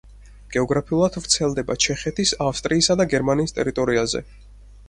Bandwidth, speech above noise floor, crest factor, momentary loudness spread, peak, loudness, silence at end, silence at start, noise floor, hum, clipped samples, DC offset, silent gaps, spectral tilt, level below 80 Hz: 11.5 kHz; 21 dB; 20 dB; 6 LU; -2 dBFS; -21 LUFS; 0.05 s; 0.05 s; -42 dBFS; none; under 0.1%; under 0.1%; none; -3.5 dB/octave; -42 dBFS